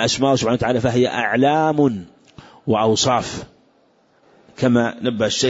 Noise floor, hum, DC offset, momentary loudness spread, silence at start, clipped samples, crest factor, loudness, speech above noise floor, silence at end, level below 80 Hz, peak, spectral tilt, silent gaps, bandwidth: -58 dBFS; none; under 0.1%; 7 LU; 0 s; under 0.1%; 14 dB; -18 LUFS; 40 dB; 0 s; -50 dBFS; -4 dBFS; -4.5 dB/octave; none; 8 kHz